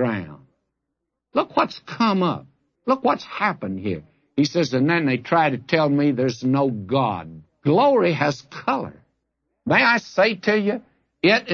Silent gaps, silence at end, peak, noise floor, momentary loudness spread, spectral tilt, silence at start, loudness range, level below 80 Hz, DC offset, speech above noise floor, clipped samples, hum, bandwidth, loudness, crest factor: none; 0 s; -4 dBFS; -80 dBFS; 12 LU; -6 dB/octave; 0 s; 3 LU; -64 dBFS; under 0.1%; 59 dB; under 0.1%; none; 7.2 kHz; -21 LUFS; 18 dB